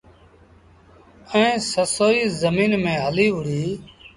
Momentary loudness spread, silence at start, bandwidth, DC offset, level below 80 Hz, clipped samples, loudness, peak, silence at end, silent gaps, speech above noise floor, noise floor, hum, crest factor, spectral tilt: 7 LU; 1.25 s; 11.5 kHz; under 0.1%; -52 dBFS; under 0.1%; -20 LUFS; -4 dBFS; 0.1 s; none; 31 dB; -51 dBFS; none; 18 dB; -4.5 dB/octave